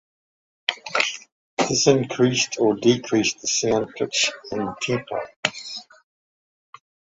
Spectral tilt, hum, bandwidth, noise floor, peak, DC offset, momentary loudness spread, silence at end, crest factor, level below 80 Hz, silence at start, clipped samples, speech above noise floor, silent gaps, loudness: -3.5 dB/octave; none; 8 kHz; under -90 dBFS; -2 dBFS; under 0.1%; 11 LU; 1.35 s; 22 dB; -60 dBFS; 0.7 s; under 0.1%; over 68 dB; 1.32-1.57 s, 5.36-5.43 s; -22 LUFS